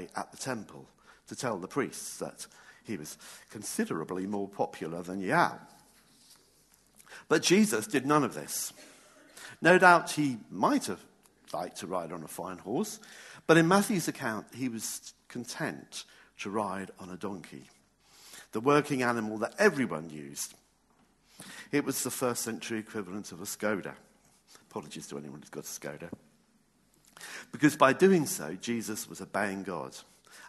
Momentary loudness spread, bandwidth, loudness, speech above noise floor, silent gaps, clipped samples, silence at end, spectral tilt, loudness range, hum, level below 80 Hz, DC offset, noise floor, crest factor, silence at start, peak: 21 LU; 13 kHz; -30 LUFS; 37 dB; none; under 0.1%; 0 s; -4.5 dB/octave; 11 LU; none; -74 dBFS; under 0.1%; -68 dBFS; 28 dB; 0 s; -4 dBFS